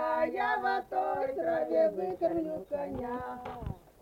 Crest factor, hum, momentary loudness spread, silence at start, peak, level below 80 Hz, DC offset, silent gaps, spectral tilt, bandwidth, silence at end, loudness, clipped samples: 14 dB; none; 12 LU; 0 s; -18 dBFS; -56 dBFS; under 0.1%; none; -7 dB/octave; 16.5 kHz; 0.25 s; -32 LUFS; under 0.1%